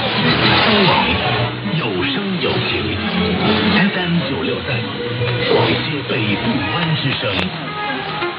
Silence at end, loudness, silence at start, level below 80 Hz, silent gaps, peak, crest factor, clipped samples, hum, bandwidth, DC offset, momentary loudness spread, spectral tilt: 0 s; -17 LUFS; 0 s; -42 dBFS; none; 0 dBFS; 18 dB; under 0.1%; none; 5.6 kHz; under 0.1%; 9 LU; -8 dB/octave